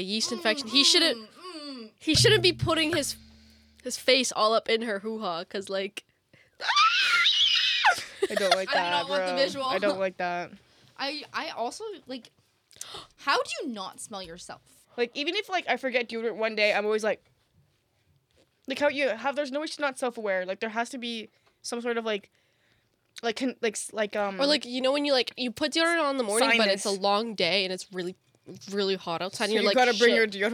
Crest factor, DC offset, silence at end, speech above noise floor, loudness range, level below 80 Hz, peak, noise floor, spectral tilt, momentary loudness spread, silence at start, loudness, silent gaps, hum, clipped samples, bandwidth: 22 dB; under 0.1%; 0 s; 42 dB; 10 LU; -62 dBFS; -6 dBFS; -69 dBFS; -2.5 dB/octave; 18 LU; 0 s; -26 LUFS; none; none; under 0.1%; 18.5 kHz